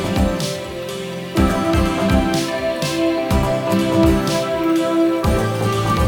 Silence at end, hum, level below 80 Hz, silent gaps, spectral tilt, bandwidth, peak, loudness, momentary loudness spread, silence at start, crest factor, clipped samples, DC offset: 0 s; none; -28 dBFS; none; -6 dB/octave; 19.5 kHz; -2 dBFS; -18 LUFS; 7 LU; 0 s; 16 dB; under 0.1%; under 0.1%